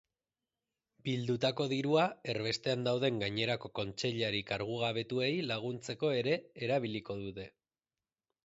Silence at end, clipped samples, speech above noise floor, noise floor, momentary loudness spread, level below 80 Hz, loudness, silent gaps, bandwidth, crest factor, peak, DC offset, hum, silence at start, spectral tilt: 1 s; under 0.1%; over 56 dB; under -90 dBFS; 9 LU; -68 dBFS; -34 LUFS; none; 8 kHz; 18 dB; -16 dBFS; under 0.1%; none; 1.05 s; -4 dB/octave